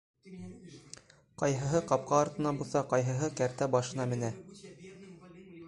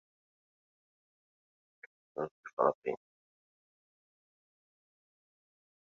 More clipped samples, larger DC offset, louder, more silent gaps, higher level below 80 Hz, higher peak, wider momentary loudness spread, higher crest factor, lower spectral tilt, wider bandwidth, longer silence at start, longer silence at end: neither; neither; first, -32 LUFS vs -36 LUFS; second, none vs 2.31-2.43 s, 2.53-2.57 s, 2.75-2.82 s; first, -64 dBFS vs -88 dBFS; about the same, -12 dBFS vs -14 dBFS; first, 22 LU vs 14 LU; second, 22 dB vs 28 dB; about the same, -6 dB/octave vs -6 dB/octave; first, 11.5 kHz vs 6.8 kHz; second, 0.25 s vs 2.15 s; second, 0 s vs 2.95 s